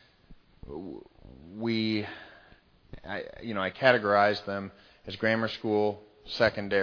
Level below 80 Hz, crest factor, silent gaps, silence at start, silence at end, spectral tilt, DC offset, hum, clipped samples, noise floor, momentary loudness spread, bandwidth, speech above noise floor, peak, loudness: -58 dBFS; 26 dB; none; 0.3 s; 0 s; -6.5 dB/octave; under 0.1%; none; under 0.1%; -59 dBFS; 20 LU; 5.4 kHz; 31 dB; -4 dBFS; -28 LUFS